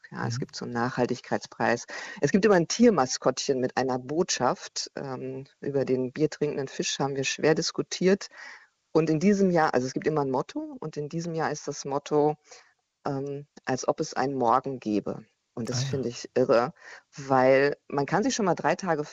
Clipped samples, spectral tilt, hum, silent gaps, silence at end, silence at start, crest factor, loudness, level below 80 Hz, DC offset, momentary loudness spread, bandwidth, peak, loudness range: under 0.1%; -5 dB/octave; none; none; 0 s; 0.1 s; 18 dB; -27 LUFS; -64 dBFS; under 0.1%; 13 LU; 8.2 kHz; -10 dBFS; 5 LU